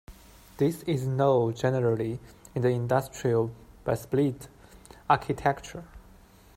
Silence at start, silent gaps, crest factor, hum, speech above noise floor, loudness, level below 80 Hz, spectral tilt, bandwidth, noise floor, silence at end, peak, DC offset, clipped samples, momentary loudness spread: 0.1 s; none; 22 dB; none; 27 dB; -28 LUFS; -54 dBFS; -7 dB/octave; 16 kHz; -54 dBFS; 0.55 s; -8 dBFS; under 0.1%; under 0.1%; 15 LU